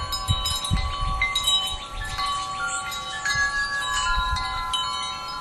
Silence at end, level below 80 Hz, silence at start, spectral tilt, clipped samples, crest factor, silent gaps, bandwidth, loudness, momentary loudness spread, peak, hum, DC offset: 0 s; -34 dBFS; 0 s; -1.5 dB/octave; under 0.1%; 18 dB; none; 15 kHz; -24 LUFS; 7 LU; -8 dBFS; none; under 0.1%